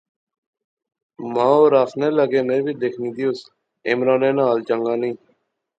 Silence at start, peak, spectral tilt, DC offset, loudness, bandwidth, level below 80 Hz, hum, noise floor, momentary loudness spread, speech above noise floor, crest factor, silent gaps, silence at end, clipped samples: 1.2 s; -2 dBFS; -7.5 dB/octave; under 0.1%; -19 LUFS; 7.8 kHz; -72 dBFS; none; -66 dBFS; 13 LU; 47 dB; 18 dB; none; 0.6 s; under 0.1%